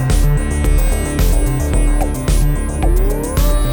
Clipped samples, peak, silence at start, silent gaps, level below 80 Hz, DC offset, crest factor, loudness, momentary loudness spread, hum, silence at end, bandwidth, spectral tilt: under 0.1%; -2 dBFS; 0 s; none; -14 dBFS; under 0.1%; 10 dB; -17 LUFS; 2 LU; none; 0 s; over 20 kHz; -5.5 dB/octave